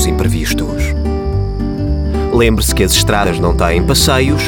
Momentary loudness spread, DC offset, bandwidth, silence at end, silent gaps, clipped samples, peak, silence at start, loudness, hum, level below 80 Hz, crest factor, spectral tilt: 7 LU; under 0.1%; 20 kHz; 0 s; none; under 0.1%; 0 dBFS; 0 s; -13 LUFS; none; -20 dBFS; 12 dB; -4.5 dB/octave